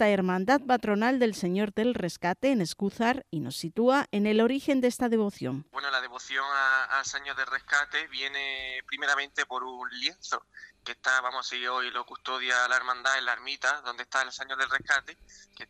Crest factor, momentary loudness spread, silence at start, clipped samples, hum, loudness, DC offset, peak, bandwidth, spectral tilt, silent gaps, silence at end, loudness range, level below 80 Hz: 18 dB; 9 LU; 0 s; under 0.1%; none; -28 LUFS; under 0.1%; -10 dBFS; 15 kHz; -4 dB/octave; none; 0.05 s; 3 LU; -66 dBFS